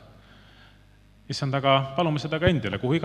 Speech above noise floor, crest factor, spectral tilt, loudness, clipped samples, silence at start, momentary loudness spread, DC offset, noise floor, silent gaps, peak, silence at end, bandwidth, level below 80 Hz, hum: 31 dB; 22 dB; -6.5 dB/octave; -25 LUFS; under 0.1%; 1.3 s; 7 LU; under 0.1%; -55 dBFS; none; -4 dBFS; 0 s; 10.5 kHz; -48 dBFS; 50 Hz at -45 dBFS